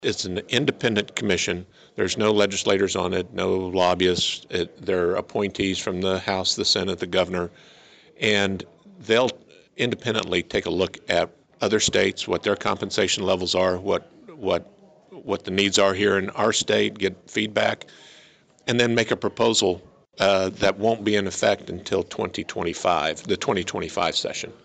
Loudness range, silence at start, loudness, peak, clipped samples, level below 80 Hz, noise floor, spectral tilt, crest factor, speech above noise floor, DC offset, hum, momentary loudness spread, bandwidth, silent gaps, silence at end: 2 LU; 0 s; -23 LUFS; -8 dBFS; under 0.1%; -56 dBFS; -54 dBFS; -3.5 dB/octave; 16 dB; 31 dB; under 0.1%; none; 8 LU; 9.4 kHz; none; 0.1 s